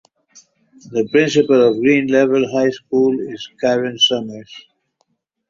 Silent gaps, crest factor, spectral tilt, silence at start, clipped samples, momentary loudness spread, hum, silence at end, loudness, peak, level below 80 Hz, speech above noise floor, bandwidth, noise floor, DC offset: none; 16 dB; -4.5 dB/octave; 0.9 s; under 0.1%; 11 LU; none; 0.9 s; -16 LUFS; -2 dBFS; -60 dBFS; 51 dB; 7.6 kHz; -67 dBFS; under 0.1%